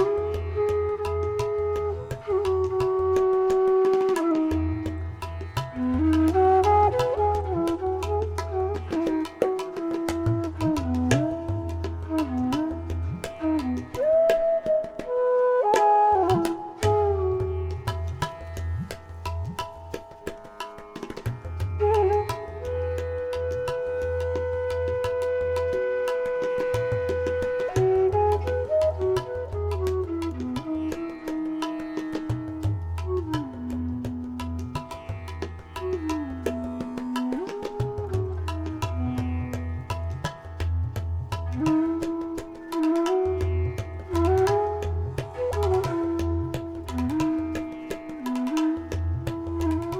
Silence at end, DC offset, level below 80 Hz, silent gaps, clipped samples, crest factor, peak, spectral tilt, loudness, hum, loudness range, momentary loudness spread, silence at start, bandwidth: 0 s; under 0.1%; -40 dBFS; none; under 0.1%; 20 dB; -6 dBFS; -7 dB/octave; -26 LUFS; none; 8 LU; 11 LU; 0 s; 15.5 kHz